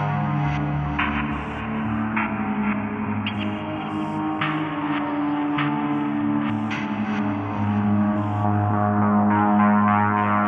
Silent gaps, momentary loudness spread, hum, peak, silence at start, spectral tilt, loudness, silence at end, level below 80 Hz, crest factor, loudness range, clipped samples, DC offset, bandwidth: none; 8 LU; none; -6 dBFS; 0 s; -8.5 dB/octave; -23 LUFS; 0 s; -46 dBFS; 16 dB; 5 LU; under 0.1%; under 0.1%; 6.2 kHz